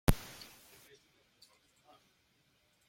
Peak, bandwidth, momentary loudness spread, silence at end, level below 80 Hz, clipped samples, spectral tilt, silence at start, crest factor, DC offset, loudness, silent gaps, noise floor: -10 dBFS; 16.5 kHz; 23 LU; 2.7 s; -44 dBFS; under 0.1%; -5.5 dB/octave; 0.1 s; 32 dB; under 0.1%; -41 LUFS; none; -73 dBFS